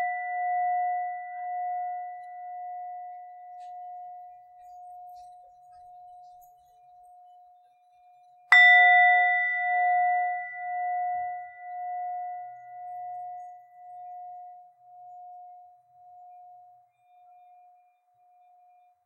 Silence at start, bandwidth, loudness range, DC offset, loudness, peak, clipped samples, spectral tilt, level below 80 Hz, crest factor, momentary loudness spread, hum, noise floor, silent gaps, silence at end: 0 s; 8.4 kHz; 26 LU; under 0.1%; -23 LUFS; -4 dBFS; under 0.1%; 1.5 dB/octave; -84 dBFS; 26 dB; 28 LU; none; -64 dBFS; none; 2.5 s